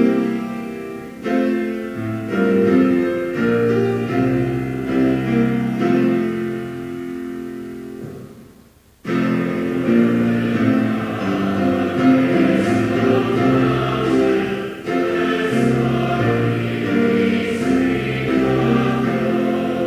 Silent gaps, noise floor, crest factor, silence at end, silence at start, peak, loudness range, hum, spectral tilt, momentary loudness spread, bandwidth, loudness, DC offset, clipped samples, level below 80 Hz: none; -49 dBFS; 16 dB; 0 s; 0 s; -2 dBFS; 5 LU; none; -7.5 dB/octave; 12 LU; 15.5 kHz; -18 LUFS; under 0.1%; under 0.1%; -46 dBFS